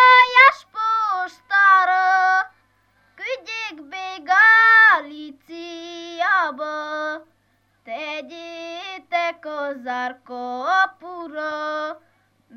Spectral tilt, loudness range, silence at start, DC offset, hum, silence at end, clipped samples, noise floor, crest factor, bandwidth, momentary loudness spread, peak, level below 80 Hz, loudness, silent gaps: -1 dB/octave; 12 LU; 0 s; under 0.1%; none; 0.6 s; under 0.1%; -64 dBFS; 18 dB; 18 kHz; 23 LU; -2 dBFS; -72 dBFS; -17 LUFS; none